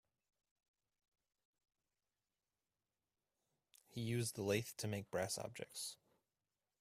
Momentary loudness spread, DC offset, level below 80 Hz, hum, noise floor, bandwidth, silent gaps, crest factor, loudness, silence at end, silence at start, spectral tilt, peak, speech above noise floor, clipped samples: 9 LU; under 0.1%; -78 dBFS; none; under -90 dBFS; 15.5 kHz; none; 26 dB; -44 LUFS; 0.85 s; 3.9 s; -4.5 dB/octave; -24 dBFS; over 47 dB; under 0.1%